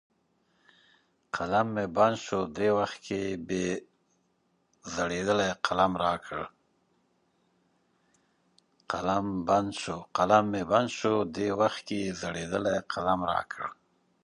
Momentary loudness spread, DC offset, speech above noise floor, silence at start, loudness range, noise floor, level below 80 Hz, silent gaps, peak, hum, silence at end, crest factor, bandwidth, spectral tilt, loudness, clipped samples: 11 LU; under 0.1%; 44 dB; 1.35 s; 6 LU; -73 dBFS; -60 dBFS; none; -8 dBFS; none; 0.5 s; 24 dB; 11.5 kHz; -5 dB/octave; -29 LUFS; under 0.1%